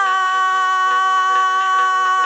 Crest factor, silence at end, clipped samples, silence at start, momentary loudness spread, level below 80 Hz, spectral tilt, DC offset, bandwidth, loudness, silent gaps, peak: 10 dB; 0 s; under 0.1%; 0 s; 1 LU; -72 dBFS; 1.5 dB/octave; under 0.1%; 8.8 kHz; -15 LUFS; none; -6 dBFS